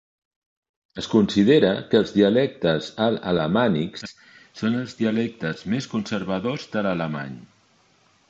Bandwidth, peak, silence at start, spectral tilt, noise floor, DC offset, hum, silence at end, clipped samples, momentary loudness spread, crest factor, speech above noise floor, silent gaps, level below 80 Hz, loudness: 7.8 kHz; -4 dBFS; 0.95 s; -6.5 dB/octave; -60 dBFS; under 0.1%; none; 0.85 s; under 0.1%; 14 LU; 18 dB; 38 dB; none; -56 dBFS; -22 LUFS